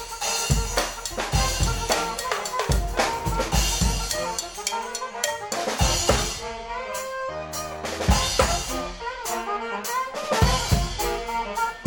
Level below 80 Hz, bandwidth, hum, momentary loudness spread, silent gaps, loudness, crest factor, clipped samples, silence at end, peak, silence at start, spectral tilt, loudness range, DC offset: -32 dBFS; 17.5 kHz; none; 9 LU; none; -25 LUFS; 22 dB; under 0.1%; 0 s; -4 dBFS; 0 s; -3 dB/octave; 2 LU; under 0.1%